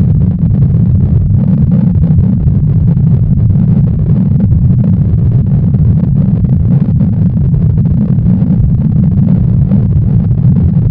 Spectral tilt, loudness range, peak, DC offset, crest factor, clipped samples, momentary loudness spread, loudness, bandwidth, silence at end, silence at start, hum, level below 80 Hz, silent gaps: -14 dB/octave; 1 LU; 0 dBFS; under 0.1%; 8 dB; 0.3%; 1 LU; -9 LUFS; 2.5 kHz; 0 s; 0 s; none; -18 dBFS; none